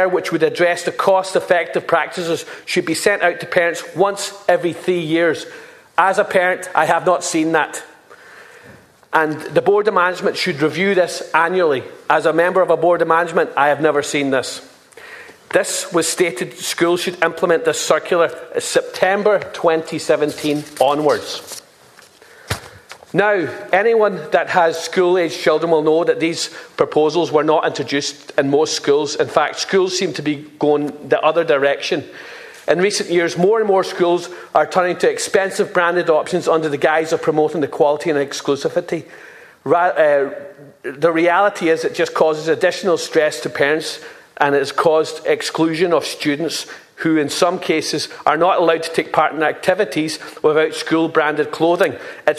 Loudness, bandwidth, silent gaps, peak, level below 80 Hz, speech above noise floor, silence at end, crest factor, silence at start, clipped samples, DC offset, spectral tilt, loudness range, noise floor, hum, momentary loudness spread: -17 LUFS; 14 kHz; none; 0 dBFS; -60 dBFS; 30 dB; 0 s; 18 dB; 0 s; under 0.1%; under 0.1%; -4 dB/octave; 3 LU; -46 dBFS; none; 7 LU